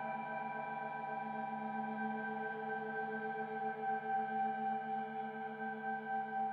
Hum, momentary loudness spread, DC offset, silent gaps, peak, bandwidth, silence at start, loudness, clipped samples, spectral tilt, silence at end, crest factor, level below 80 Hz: none; 5 LU; under 0.1%; none; -28 dBFS; 4.8 kHz; 0 s; -41 LUFS; under 0.1%; -4 dB/octave; 0 s; 12 dB; under -90 dBFS